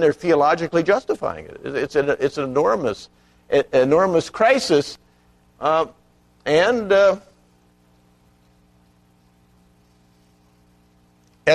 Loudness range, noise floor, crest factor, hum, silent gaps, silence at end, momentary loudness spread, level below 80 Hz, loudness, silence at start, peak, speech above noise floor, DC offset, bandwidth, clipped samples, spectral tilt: 3 LU; -57 dBFS; 18 dB; 60 Hz at -55 dBFS; none; 0 s; 13 LU; -56 dBFS; -19 LUFS; 0 s; -4 dBFS; 38 dB; under 0.1%; 12.5 kHz; under 0.1%; -5 dB/octave